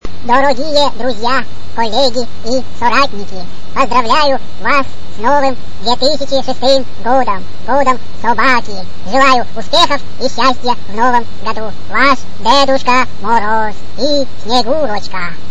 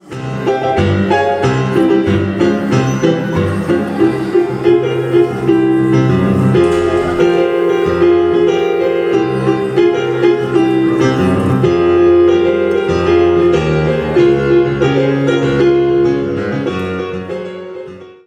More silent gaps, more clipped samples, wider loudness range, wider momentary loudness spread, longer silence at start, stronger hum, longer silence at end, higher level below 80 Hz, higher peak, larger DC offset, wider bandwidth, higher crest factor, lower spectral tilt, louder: neither; first, 0.5% vs under 0.1%; about the same, 2 LU vs 2 LU; first, 10 LU vs 7 LU; about the same, 0 s vs 0.05 s; neither; second, 0 s vs 0.15 s; about the same, -38 dBFS vs -38 dBFS; about the same, 0 dBFS vs 0 dBFS; first, 30% vs under 0.1%; first, 11 kHz vs 9.4 kHz; about the same, 16 dB vs 12 dB; second, -3.5 dB/octave vs -7.5 dB/octave; about the same, -13 LUFS vs -13 LUFS